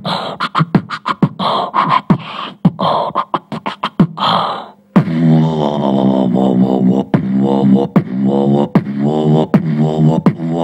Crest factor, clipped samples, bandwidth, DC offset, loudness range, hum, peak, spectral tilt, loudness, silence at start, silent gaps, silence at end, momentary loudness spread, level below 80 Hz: 14 dB; under 0.1%; 8.6 kHz; under 0.1%; 3 LU; none; 0 dBFS; -8.5 dB/octave; -14 LUFS; 0 s; none; 0 s; 7 LU; -48 dBFS